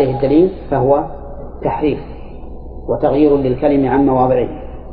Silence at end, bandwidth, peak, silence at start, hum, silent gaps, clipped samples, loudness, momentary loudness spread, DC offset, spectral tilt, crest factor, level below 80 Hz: 0 s; 4.8 kHz; -2 dBFS; 0 s; none; none; under 0.1%; -15 LUFS; 20 LU; under 0.1%; -12 dB/octave; 14 dB; -32 dBFS